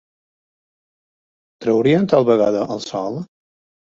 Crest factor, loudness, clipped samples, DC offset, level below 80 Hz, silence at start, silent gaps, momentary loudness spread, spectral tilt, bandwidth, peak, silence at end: 18 dB; -18 LUFS; under 0.1%; under 0.1%; -60 dBFS; 1.6 s; none; 13 LU; -7 dB/octave; 7.8 kHz; -2 dBFS; 0.55 s